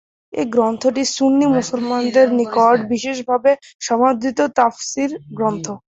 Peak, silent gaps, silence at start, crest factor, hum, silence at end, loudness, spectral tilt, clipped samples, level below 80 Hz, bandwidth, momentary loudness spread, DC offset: -2 dBFS; 3.75-3.79 s; 0.35 s; 16 dB; none; 0.15 s; -17 LUFS; -4 dB/octave; under 0.1%; -60 dBFS; 8 kHz; 8 LU; under 0.1%